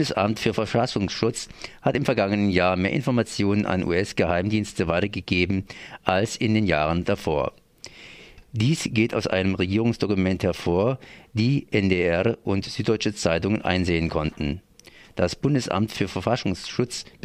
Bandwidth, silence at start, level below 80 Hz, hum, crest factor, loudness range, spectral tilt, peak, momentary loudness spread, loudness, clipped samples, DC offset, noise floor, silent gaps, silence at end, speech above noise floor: 15.5 kHz; 0 s; -46 dBFS; none; 22 dB; 2 LU; -6 dB/octave; -2 dBFS; 8 LU; -24 LUFS; under 0.1%; under 0.1%; -50 dBFS; none; 0.2 s; 27 dB